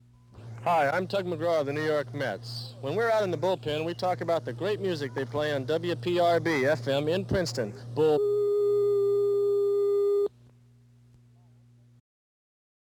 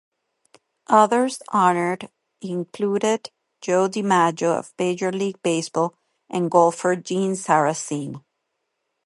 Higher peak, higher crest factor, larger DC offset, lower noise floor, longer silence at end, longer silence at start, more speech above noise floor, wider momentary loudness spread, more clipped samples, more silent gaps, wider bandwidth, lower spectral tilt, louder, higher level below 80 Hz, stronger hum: second, -14 dBFS vs -2 dBFS; second, 14 dB vs 22 dB; neither; second, -58 dBFS vs -77 dBFS; first, 2.7 s vs 0.85 s; second, 0.35 s vs 0.9 s; second, 30 dB vs 56 dB; second, 8 LU vs 13 LU; neither; neither; first, 17 kHz vs 11.5 kHz; about the same, -6 dB/octave vs -5 dB/octave; second, -27 LUFS vs -21 LUFS; first, -60 dBFS vs -72 dBFS; first, 60 Hz at -55 dBFS vs none